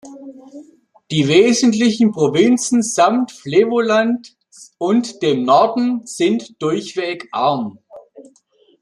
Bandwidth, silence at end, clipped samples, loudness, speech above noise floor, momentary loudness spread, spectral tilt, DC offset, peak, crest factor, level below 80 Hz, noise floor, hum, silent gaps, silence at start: 12 kHz; 0.6 s; under 0.1%; -16 LUFS; 40 dB; 10 LU; -4.5 dB/octave; under 0.1%; -2 dBFS; 16 dB; -62 dBFS; -55 dBFS; none; none; 0.05 s